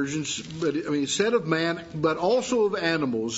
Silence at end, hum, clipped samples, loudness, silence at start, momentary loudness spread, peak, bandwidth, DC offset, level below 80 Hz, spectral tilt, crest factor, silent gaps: 0 s; none; under 0.1%; -25 LUFS; 0 s; 5 LU; -8 dBFS; 8 kHz; under 0.1%; -62 dBFS; -4 dB/octave; 18 dB; none